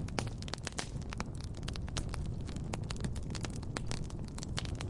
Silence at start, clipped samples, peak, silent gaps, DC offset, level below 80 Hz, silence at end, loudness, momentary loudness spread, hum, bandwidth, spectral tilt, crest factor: 0 s; under 0.1%; -14 dBFS; none; under 0.1%; -44 dBFS; 0 s; -41 LUFS; 3 LU; none; 11.5 kHz; -4.5 dB/octave; 24 dB